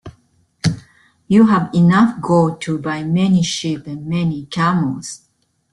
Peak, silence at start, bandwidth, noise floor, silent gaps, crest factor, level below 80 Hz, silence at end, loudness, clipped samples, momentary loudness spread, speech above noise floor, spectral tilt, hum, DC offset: -2 dBFS; 0.05 s; 11.5 kHz; -57 dBFS; none; 14 dB; -52 dBFS; 0.55 s; -16 LUFS; under 0.1%; 12 LU; 41 dB; -6.5 dB/octave; none; under 0.1%